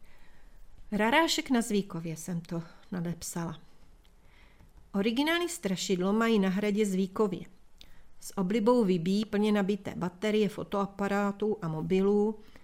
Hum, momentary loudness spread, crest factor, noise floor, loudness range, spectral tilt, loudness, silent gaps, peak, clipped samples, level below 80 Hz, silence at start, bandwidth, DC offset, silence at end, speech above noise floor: none; 12 LU; 18 dB; -56 dBFS; 6 LU; -5.5 dB/octave; -30 LUFS; none; -12 dBFS; under 0.1%; -56 dBFS; 0 s; 16 kHz; under 0.1%; 0 s; 27 dB